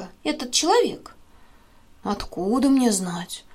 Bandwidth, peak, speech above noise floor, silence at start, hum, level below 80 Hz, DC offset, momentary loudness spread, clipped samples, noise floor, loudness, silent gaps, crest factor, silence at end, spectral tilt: 15.5 kHz; -6 dBFS; 29 dB; 0 s; none; -50 dBFS; under 0.1%; 13 LU; under 0.1%; -51 dBFS; -22 LUFS; none; 18 dB; 0 s; -3.5 dB/octave